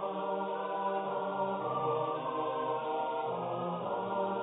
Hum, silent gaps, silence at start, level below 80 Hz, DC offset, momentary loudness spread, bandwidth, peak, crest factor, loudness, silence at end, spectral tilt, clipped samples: none; none; 0 s; -80 dBFS; under 0.1%; 3 LU; 3.9 kHz; -22 dBFS; 12 dB; -35 LUFS; 0 s; -2.5 dB/octave; under 0.1%